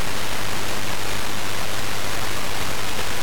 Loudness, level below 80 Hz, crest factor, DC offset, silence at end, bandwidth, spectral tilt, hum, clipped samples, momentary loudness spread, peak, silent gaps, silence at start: -26 LUFS; -42 dBFS; 16 dB; 20%; 0 s; over 20 kHz; -2.5 dB/octave; none; under 0.1%; 0 LU; -12 dBFS; none; 0 s